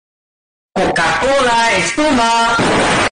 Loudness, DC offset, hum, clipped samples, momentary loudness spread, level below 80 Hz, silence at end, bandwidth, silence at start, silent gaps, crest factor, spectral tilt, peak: -13 LUFS; under 0.1%; none; under 0.1%; 4 LU; -38 dBFS; 0 s; 10 kHz; 0.75 s; none; 10 dB; -3 dB/octave; -4 dBFS